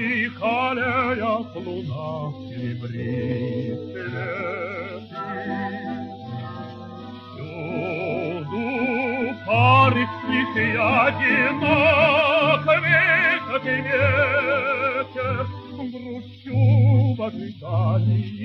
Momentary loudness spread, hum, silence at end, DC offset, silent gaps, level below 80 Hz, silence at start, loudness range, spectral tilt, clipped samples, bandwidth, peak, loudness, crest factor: 17 LU; none; 0 s; under 0.1%; none; -56 dBFS; 0 s; 12 LU; -8 dB/octave; under 0.1%; 5.8 kHz; -4 dBFS; -21 LUFS; 18 dB